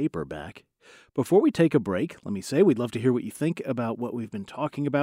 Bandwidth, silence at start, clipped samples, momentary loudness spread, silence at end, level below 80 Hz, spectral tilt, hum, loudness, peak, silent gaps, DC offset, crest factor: 16 kHz; 0 s; under 0.1%; 13 LU; 0 s; -62 dBFS; -7 dB/octave; none; -26 LUFS; -8 dBFS; none; under 0.1%; 18 dB